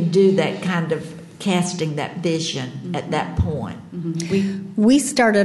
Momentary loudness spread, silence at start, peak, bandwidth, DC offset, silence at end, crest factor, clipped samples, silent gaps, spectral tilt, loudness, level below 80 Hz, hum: 12 LU; 0 s; -6 dBFS; 12.5 kHz; under 0.1%; 0 s; 14 dB; under 0.1%; none; -5.5 dB/octave; -21 LUFS; -40 dBFS; none